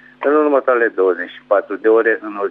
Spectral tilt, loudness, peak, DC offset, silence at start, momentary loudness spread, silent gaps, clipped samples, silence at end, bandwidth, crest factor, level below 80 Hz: -7 dB/octave; -16 LUFS; -2 dBFS; under 0.1%; 0.2 s; 5 LU; none; under 0.1%; 0 s; 3.9 kHz; 14 dB; -72 dBFS